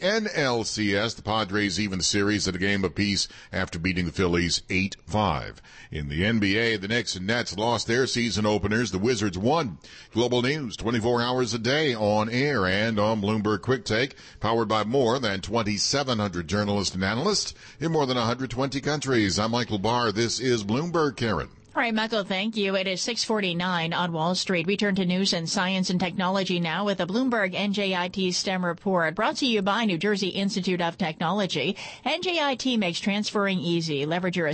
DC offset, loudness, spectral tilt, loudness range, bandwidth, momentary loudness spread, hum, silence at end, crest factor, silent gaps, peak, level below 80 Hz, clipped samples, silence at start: under 0.1%; -25 LUFS; -4.5 dB/octave; 1 LU; 8.8 kHz; 4 LU; none; 0 s; 14 dB; none; -12 dBFS; -50 dBFS; under 0.1%; 0 s